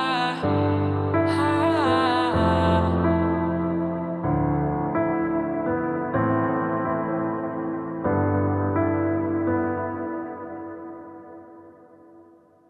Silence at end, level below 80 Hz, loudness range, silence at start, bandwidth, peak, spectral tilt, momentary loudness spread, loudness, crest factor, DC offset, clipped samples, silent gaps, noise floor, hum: 0.5 s; -48 dBFS; 6 LU; 0 s; 10.5 kHz; -8 dBFS; -8 dB/octave; 13 LU; -24 LUFS; 14 dB; under 0.1%; under 0.1%; none; -53 dBFS; none